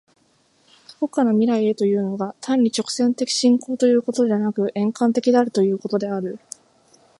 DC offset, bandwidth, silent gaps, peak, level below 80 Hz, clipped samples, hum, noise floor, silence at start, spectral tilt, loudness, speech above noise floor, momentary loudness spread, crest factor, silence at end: under 0.1%; 11.5 kHz; none; -4 dBFS; -72 dBFS; under 0.1%; none; -61 dBFS; 1 s; -5.5 dB/octave; -20 LUFS; 41 dB; 10 LU; 16 dB; 0.8 s